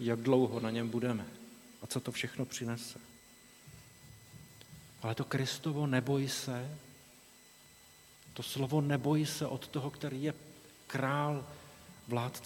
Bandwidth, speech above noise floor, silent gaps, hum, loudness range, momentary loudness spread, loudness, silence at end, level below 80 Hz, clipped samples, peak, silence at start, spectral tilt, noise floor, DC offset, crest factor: 19 kHz; 25 dB; none; none; 7 LU; 25 LU; -35 LUFS; 0 s; -70 dBFS; under 0.1%; -16 dBFS; 0 s; -5.5 dB/octave; -60 dBFS; under 0.1%; 20 dB